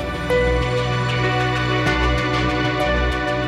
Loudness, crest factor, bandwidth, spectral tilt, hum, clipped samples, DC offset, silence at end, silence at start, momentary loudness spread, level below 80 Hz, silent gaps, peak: -19 LUFS; 14 dB; 12.5 kHz; -6 dB/octave; none; under 0.1%; under 0.1%; 0 s; 0 s; 2 LU; -28 dBFS; none; -6 dBFS